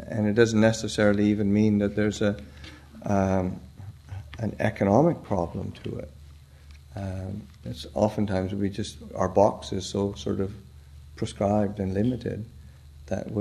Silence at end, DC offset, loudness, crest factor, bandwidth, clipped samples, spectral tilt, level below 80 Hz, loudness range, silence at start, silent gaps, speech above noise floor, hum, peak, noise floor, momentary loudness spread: 0 s; under 0.1%; -26 LUFS; 22 dB; 12.5 kHz; under 0.1%; -6.5 dB/octave; -48 dBFS; 7 LU; 0 s; none; 23 dB; none; -6 dBFS; -48 dBFS; 19 LU